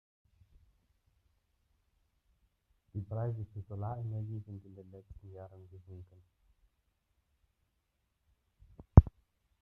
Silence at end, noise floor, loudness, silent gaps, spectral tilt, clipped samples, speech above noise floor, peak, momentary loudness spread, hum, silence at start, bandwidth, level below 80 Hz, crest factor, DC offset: 0.5 s; -81 dBFS; -31 LUFS; none; -12.5 dB/octave; under 0.1%; 38 dB; -4 dBFS; 29 LU; none; 2.95 s; 2.2 kHz; -44 dBFS; 32 dB; under 0.1%